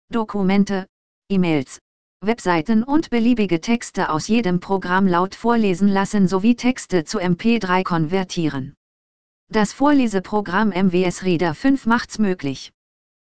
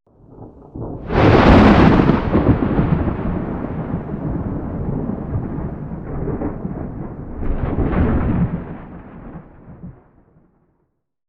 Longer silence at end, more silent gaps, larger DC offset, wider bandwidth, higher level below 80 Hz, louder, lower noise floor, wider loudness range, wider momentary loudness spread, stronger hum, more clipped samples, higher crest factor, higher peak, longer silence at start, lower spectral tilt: second, 0.6 s vs 1.35 s; first, 0.89-1.22 s, 1.81-2.20 s, 8.77-9.47 s vs none; first, 2% vs under 0.1%; first, 9.4 kHz vs 7.6 kHz; second, -46 dBFS vs -26 dBFS; about the same, -20 LUFS vs -18 LUFS; first, under -90 dBFS vs -68 dBFS; second, 2 LU vs 11 LU; second, 7 LU vs 25 LU; neither; neither; about the same, 16 dB vs 18 dB; about the same, -2 dBFS vs 0 dBFS; second, 0.05 s vs 0.3 s; second, -6 dB/octave vs -9 dB/octave